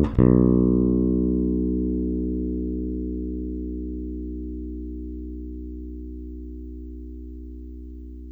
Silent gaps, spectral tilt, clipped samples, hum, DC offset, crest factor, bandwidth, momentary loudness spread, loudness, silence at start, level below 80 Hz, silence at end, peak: none; -12.5 dB/octave; under 0.1%; 60 Hz at -90 dBFS; under 0.1%; 22 dB; 3.8 kHz; 20 LU; -24 LUFS; 0 s; -32 dBFS; 0 s; -4 dBFS